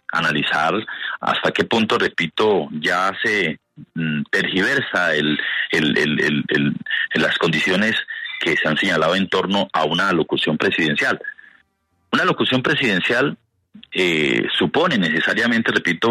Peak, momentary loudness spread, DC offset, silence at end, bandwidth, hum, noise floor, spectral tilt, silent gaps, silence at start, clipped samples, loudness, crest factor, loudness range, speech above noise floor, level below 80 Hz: -4 dBFS; 6 LU; under 0.1%; 0 s; 13.5 kHz; none; -67 dBFS; -5 dB/octave; none; 0.1 s; under 0.1%; -18 LUFS; 16 dB; 1 LU; 48 dB; -58 dBFS